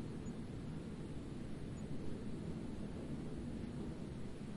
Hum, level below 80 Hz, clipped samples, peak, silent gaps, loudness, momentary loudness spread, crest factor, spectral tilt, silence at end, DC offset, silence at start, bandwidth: none; -56 dBFS; under 0.1%; -32 dBFS; none; -47 LUFS; 2 LU; 14 dB; -7.5 dB/octave; 0 s; under 0.1%; 0 s; 11.5 kHz